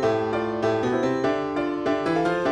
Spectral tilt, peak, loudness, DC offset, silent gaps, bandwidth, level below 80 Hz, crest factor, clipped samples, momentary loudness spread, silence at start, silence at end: -6.5 dB/octave; -10 dBFS; -24 LUFS; under 0.1%; none; 10.5 kHz; -54 dBFS; 14 dB; under 0.1%; 3 LU; 0 s; 0 s